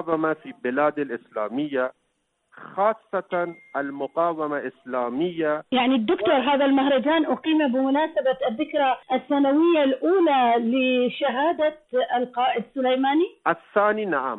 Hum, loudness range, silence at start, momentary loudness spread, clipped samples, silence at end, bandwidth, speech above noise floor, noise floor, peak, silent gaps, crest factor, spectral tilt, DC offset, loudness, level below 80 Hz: none; 6 LU; 0 s; 9 LU; under 0.1%; 0 s; 4.1 kHz; 50 dB; -73 dBFS; -6 dBFS; none; 16 dB; -8 dB/octave; under 0.1%; -23 LUFS; -68 dBFS